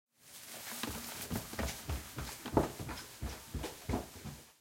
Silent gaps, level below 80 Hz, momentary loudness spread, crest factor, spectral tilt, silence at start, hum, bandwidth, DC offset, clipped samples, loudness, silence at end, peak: none; -50 dBFS; 13 LU; 28 dB; -4.5 dB/octave; 0.2 s; none; 16.5 kHz; under 0.1%; under 0.1%; -41 LUFS; 0.1 s; -12 dBFS